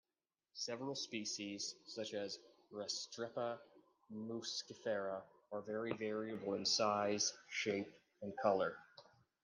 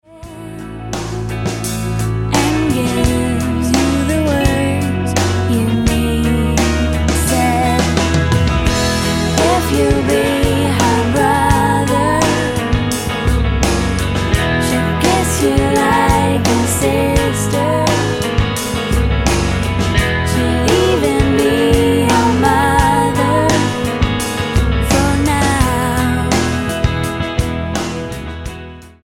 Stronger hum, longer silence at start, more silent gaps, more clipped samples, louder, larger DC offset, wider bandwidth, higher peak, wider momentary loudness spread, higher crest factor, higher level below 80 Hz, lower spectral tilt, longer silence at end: neither; first, 0.55 s vs 0.1 s; neither; neither; second, -42 LUFS vs -15 LUFS; neither; second, 11 kHz vs 16.5 kHz; second, -22 dBFS vs 0 dBFS; first, 14 LU vs 7 LU; first, 22 dB vs 14 dB; second, -88 dBFS vs -24 dBFS; second, -2.5 dB/octave vs -5 dB/octave; first, 0.4 s vs 0.15 s